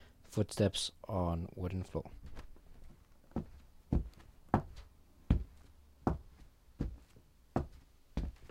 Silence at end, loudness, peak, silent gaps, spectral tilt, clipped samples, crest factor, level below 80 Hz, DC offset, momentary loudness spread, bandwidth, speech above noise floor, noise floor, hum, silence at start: 0 s; -39 LUFS; -12 dBFS; none; -6 dB/octave; under 0.1%; 28 dB; -46 dBFS; under 0.1%; 20 LU; 15.5 kHz; 26 dB; -63 dBFS; none; 0 s